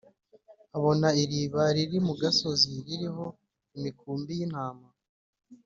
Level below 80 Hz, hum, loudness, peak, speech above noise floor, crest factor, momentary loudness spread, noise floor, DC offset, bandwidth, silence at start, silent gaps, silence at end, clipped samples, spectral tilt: -66 dBFS; none; -28 LUFS; -10 dBFS; 30 dB; 20 dB; 14 LU; -58 dBFS; under 0.1%; 7.6 kHz; 0.5 s; 5.09-5.33 s; 0.1 s; under 0.1%; -5 dB/octave